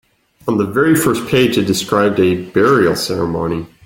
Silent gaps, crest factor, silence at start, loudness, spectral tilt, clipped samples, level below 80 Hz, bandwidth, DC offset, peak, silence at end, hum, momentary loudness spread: none; 14 dB; 0.45 s; -15 LUFS; -5 dB/octave; under 0.1%; -46 dBFS; 17 kHz; under 0.1%; 0 dBFS; 0.2 s; none; 7 LU